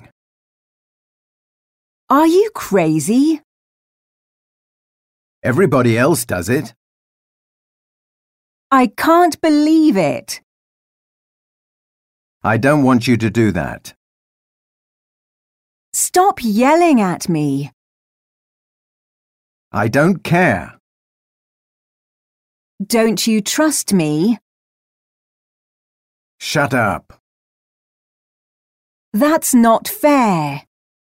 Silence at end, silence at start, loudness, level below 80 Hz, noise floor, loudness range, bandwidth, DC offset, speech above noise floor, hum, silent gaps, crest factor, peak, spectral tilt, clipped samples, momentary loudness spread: 0.6 s; 2.1 s; -15 LUFS; -52 dBFS; under -90 dBFS; 5 LU; 16 kHz; under 0.1%; over 76 dB; none; 3.44-5.42 s, 6.76-8.70 s, 10.43-12.41 s, 13.96-15.92 s, 17.73-19.71 s, 20.80-22.78 s, 24.42-26.39 s, 27.20-29.12 s; 16 dB; -2 dBFS; -5 dB/octave; under 0.1%; 12 LU